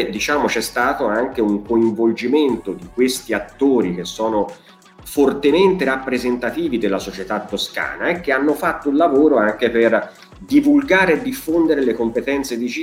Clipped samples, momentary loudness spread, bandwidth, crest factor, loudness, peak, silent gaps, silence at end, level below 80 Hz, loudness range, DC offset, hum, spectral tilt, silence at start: under 0.1%; 9 LU; 16.5 kHz; 16 dB; -18 LUFS; -2 dBFS; none; 0 s; -48 dBFS; 4 LU; under 0.1%; none; -5 dB/octave; 0 s